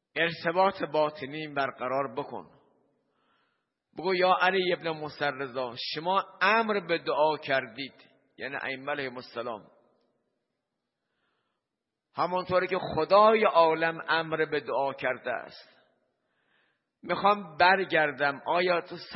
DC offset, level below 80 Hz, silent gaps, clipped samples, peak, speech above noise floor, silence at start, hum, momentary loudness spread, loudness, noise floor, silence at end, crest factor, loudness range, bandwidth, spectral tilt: under 0.1%; -70 dBFS; none; under 0.1%; -8 dBFS; 59 dB; 0.15 s; none; 14 LU; -27 LUFS; -86 dBFS; 0 s; 22 dB; 13 LU; 5.8 kHz; -8.5 dB/octave